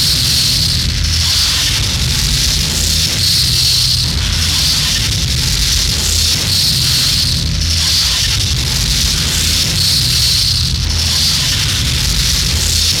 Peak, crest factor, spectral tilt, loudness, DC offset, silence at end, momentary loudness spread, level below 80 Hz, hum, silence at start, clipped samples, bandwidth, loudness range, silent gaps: -2 dBFS; 12 dB; -1.5 dB/octave; -11 LUFS; under 0.1%; 0 s; 4 LU; -22 dBFS; none; 0 s; under 0.1%; 18.5 kHz; 0 LU; none